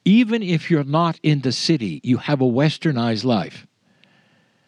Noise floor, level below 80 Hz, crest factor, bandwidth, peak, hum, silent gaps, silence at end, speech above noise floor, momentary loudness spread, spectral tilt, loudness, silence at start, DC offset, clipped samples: -59 dBFS; -70 dBFS; 16 dB; 10.5 kHz; -4 dBFS; none; none; 1.1 s; 40 dB; 5 LU; -6.5 dB/octave; -20 LUFS; 0.05 s; under 0.1%; under 0.1%